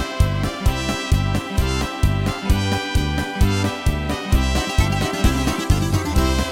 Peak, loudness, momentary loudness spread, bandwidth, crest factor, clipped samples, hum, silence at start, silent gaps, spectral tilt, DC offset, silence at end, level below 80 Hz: -2 dBFS; -21 LUFS; 3 LU; 16.5 kHz; 16 dB; under 0.1%; none; 0 s; none; -5 dB/octave; under 0.1%; 0 s; -24 dBFS